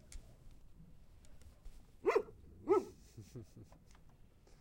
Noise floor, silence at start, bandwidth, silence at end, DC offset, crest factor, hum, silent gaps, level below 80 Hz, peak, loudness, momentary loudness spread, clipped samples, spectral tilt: -62 dBFS; 0.1 s; 16.5 kHz; 0.85 s; under 0.1%; 22 dB; none; none; -60 dBFS; -20 dBFS; -37 LUFS; 27 LU; under 0.1%; -6.5 dB/octave